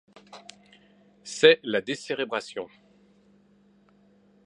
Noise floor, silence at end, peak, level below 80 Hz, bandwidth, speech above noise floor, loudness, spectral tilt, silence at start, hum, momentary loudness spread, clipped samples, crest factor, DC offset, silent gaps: -61 dBFS; 1.8 s; -4 dBFS; -78 dBFS; 10.5 kHz; 36 dB; -24 LUFS; -3 dB/octave; 0.35 s; none; 27 LU; under 0.1%; 26 dB; under 0.1%; none